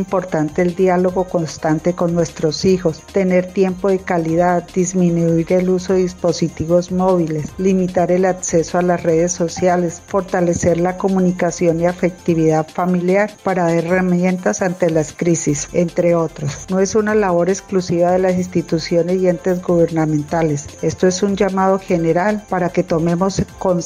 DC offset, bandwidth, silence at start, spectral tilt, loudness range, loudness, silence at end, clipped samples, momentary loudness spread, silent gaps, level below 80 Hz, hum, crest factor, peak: under 0.1%; 11 kHz; 0 s; -6 dB/octave; 1 LU; -17 LUFS; 0 s; under 0.1%; 4 LU; none; -44 dBFS; none; 14 dB; -2 dBFS